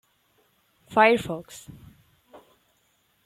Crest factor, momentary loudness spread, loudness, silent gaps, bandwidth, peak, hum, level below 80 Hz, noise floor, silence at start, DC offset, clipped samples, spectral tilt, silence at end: 24 dB; 25 LU; -22 LUFS; none; 15.5 kHz; -6 dBFS; none; -62 dBFS; -68 dBFS; 0.9 s; under 0.1%; under 0.1%; -4.5 dB/octave; 1.55 s